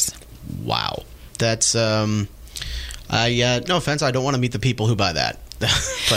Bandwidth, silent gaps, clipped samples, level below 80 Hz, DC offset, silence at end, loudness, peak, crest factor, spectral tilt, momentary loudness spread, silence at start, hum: 16 kHz; none; under 0.1%; -38 dBFS; under 0.1%; 0 s; -21 LUFS; -4 dBFS; 18 dB; -3.5 dB/octave; 14 LU; 0 s; none